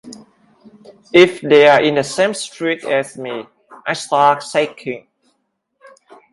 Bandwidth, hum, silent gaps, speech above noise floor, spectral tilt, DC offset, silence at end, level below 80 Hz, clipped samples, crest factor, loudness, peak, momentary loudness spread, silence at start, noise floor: 11.5 kHz; none; none; 54 dB; -4 dB/octave; under 0.1%; 1.35 s; -64 dBFS; under 0.1%; 18 dB; -15 LUFS; 0 dBFS; 17 LU; 0.05 s; -69 dBFS